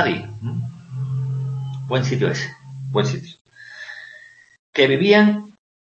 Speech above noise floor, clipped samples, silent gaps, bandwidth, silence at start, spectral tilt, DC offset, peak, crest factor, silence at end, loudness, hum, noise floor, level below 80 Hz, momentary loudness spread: 27 dB; under 0.1%; 3.41-3.45 s, 4.59-4.73 s; 7.8 kHz; 0 s; -6.5 dB/octave; under 0.1%; -2 dBFS; 20 dB; 0.45 s; -21 LUFS; none; -46 dBFS; -60 dBFS; 21 LU